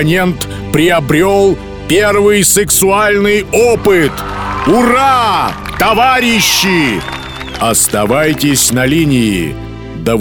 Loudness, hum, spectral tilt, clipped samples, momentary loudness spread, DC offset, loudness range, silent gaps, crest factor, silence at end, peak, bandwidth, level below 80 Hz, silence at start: -10 LUFS; none; -3.5 dB/octave; under 0.1%; 10 LU; under 0.1%; 2 LU; none; 10 dB; 0 s; 0 dBFS; over 20 kHz; -32 dBFS; 0 s